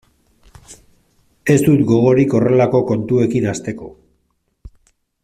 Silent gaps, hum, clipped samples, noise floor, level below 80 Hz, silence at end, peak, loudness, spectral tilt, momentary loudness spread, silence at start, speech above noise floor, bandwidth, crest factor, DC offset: none; none; under 0.1%; -66 dBFS; -48 dBFS; 0.55 s; -2 dBFS; -15 LUFS; -7.5 dB/octave; 14 LU; 0.7 s; 52 dB; 14.5 kHz; 14 dB; under 0.1%